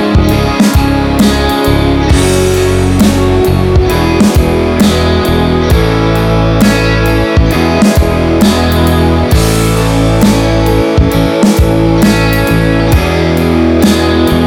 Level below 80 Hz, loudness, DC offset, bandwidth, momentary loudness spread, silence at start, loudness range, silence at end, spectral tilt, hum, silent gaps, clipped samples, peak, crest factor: -16 dBFS; -9 LUFS; under 0.1%; 19.5 kHz; 2 LU; 0 s; 0 LU; 0 s; -6 dB/octave; none; none; under 0.1%; 0 dBFS; 8 dB